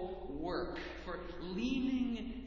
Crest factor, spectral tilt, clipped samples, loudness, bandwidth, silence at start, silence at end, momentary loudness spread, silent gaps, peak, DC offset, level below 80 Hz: 14 dB; -6.5 dB/octave; under 0.1%; -39 LUFS; 7.2 kHz; 0 s; 0 s; 9 LU; none; -26 dBFS; under 0.1%; -52 dBFS